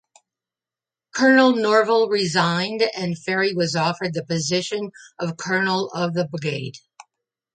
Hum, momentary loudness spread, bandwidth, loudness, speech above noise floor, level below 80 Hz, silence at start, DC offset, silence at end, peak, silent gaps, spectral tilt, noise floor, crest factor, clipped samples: none; 13 LU; 9.4 kHz; -21 LUFS; over 69 dB; -68 dBFS; 1.15 s; under 0.1%; 0.75 s; -2 dBFS; none; -4.5 dB/octave; under -90 dBFS; 18 dB; under 0.1%